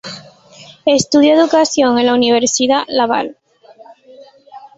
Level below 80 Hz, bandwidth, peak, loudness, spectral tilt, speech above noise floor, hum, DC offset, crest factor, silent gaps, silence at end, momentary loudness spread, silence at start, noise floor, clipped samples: -56 dBFS; 8.2 kHz; 0 dBFS; -13 LUFS; -3 dB/octave; 31 dB; none; under 0.1%; 14 dB; none; 0.1 s; 11 LU; 0.05 s; -43 dBFS; under 0.1%